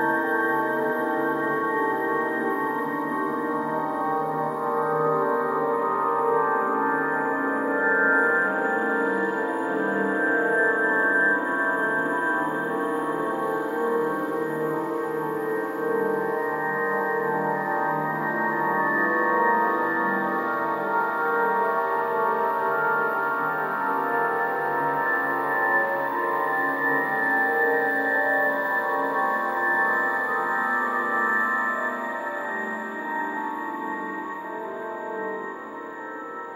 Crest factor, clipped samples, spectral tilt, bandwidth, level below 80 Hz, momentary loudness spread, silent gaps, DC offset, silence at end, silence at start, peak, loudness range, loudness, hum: 16 dB; under 0.1%; -6.5 dB/octave; 16 kHz; -74 dBFS; 8 LU; none; under 0.1%; 0 s; 0 s; -10 dBFS; 4 LU; -24 LUFS; none